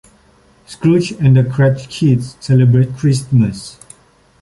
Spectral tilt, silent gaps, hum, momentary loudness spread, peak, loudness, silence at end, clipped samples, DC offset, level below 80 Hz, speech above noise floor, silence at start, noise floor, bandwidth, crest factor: -7.5 dB/octave; none; none; 7 LU; -2 dBFS; -14 LUFS; 0.7 s; under 0.1%; under 0.1%; -44 dBFS; 37 dB; 0.7 s; -50 dBFS; 11.5 kHz; 12 dB